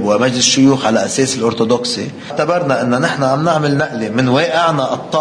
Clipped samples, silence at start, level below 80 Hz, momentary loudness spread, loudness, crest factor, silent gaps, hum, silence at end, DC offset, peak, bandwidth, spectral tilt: under 0.1%; 0 s; -54 dBFS; 7 LU; -14 LUFS; 14 dB; none; none; 0 s; under 0.1%; 0 dBFS; 10.5 kHz; -4 dB/octave